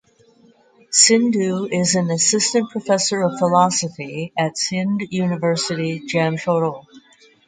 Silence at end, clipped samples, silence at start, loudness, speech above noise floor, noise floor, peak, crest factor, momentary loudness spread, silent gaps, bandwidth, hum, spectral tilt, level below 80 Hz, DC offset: 0.5 s; under 0.1%; 0.9 s; -18 LUFS; 34 dB; -53 dBFS; 0 dBFS; 20 dB; 9 LU; none; 9.6 kHz; none; -3.5 dB/octave; -64 dBFS; under 0.1%